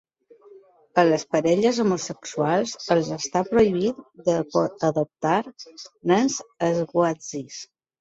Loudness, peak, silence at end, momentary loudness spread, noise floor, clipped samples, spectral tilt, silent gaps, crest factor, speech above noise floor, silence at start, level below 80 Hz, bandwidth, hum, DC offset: -23 LUFS; -4 dBFS; 0.35 s; 12 LU; -52 dBFS; under 0.1%; -5 dB/octave; none; 20 dB; 29 dB; 0.95 s; -60 dBFS; 8 kHz; none; under 0.1%